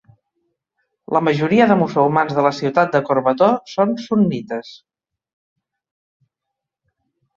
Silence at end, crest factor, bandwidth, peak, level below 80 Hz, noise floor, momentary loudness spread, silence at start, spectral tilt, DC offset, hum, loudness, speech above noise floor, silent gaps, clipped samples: 2.6 s; 18 dB; 7.4 kHz; -2 dBFS; -62 dBFS; -82 dBFS; 6 LU; 1.1 s; -7.5 dB/octave; under 0.1%; none; -17 LUFS; 65 dB; none; under 0.1%